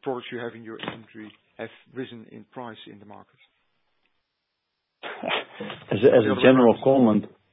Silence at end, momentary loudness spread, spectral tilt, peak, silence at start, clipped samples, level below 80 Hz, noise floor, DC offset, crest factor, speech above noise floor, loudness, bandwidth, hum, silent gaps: 0.25 s; 23 LU; -11 dB/octave; -2 dBFS; 0.05 s; under 0.1%; -64 dBFS; -79 dBFS; under 0.1%; 24 dB; 56 dB; -20 LUFS; 4 kHz; none; none